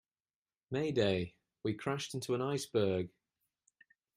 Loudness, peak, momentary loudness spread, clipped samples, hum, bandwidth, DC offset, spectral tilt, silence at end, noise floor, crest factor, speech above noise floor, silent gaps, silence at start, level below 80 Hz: -36 LUFS; -18 dBFS; 9 LU; under 0.1%; none; 15.5 kHz; under 0.1%; -5.5 dB/octave; 1.1 s; under -90 dBFS; 20 dB; over 55 dB; none; 0.7 s; -70 dBFS